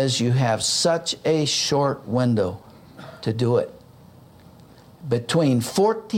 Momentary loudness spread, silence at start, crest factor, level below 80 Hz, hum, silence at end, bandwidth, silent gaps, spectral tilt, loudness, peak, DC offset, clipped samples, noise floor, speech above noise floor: 12 LU; 0 s; 16 dB; -60 dBFS; none; 0 s; 16.5 kHz; none; -4.5 dB/octave; -22 LUFS; -8 dBFS; under 0.1%; under 0.1%; -48 dBFS; 27 dB